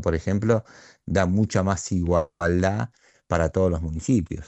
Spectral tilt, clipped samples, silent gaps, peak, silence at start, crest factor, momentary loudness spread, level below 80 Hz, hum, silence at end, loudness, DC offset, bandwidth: -6.5 dB/octave; under 0.1%; none; -6 dBFS; 0 s; 18 dB; 6 LU; -40 dBFS; none; 0 s; -24 LUFS; under 0.1%; 8.4 kHz